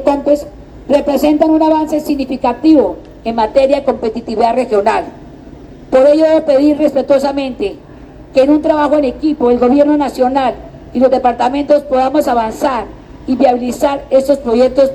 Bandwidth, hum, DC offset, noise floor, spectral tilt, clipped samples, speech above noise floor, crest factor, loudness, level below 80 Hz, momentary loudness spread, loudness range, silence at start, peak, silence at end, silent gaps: 13 kHz; none; under 0.1%; -34 dBFS; -6 dB/octave; under 0.1%; 23 dB; 12 dB; -12 LUFS; -38 dBFS; 9 LU; 2 LU; 0 s; 0 dBFS; 0 s; none